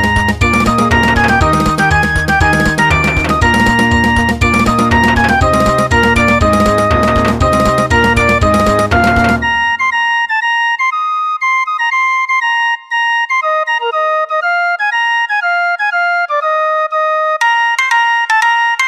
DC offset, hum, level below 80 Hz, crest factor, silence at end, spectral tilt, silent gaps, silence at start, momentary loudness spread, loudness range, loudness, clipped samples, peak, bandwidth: 0.2%; none; -24 dBFS; 10 dB; 0 s; -5 dB/octave; none; 0 s; 4 LU; 3 LU; -11 LUFS; under 0.1%; 0 dBFS; 15.5 kHz